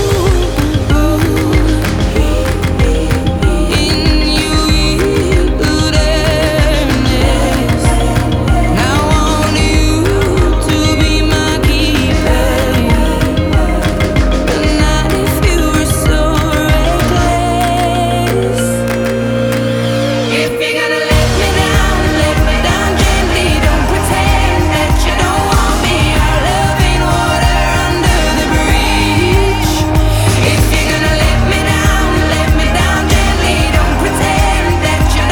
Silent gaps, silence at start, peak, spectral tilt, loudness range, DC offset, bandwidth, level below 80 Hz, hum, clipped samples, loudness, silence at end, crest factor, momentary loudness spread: none; 0 s; 0 dBFS; -5 dB/octave; 1 LU; under 0.1%; 19.5 kHz; -16 dBFS; none; under 0.1%; -12 LUFS; 0 s; 10 dB; 2 LU